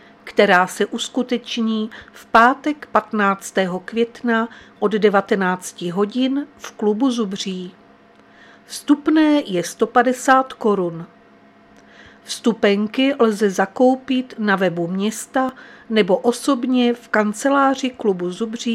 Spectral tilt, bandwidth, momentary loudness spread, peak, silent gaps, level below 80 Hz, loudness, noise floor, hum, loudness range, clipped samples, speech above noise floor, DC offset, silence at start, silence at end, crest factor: -4.5 dB/octave; 15.5 kHz; 10 LU; 0 dBFS; none; -64 dBFS; -19 LUFS; -49 dBFS; none; 2 LU; under 0.1%; 31 dB; under 0.1%; 0.25 s; 0 s; 20 dB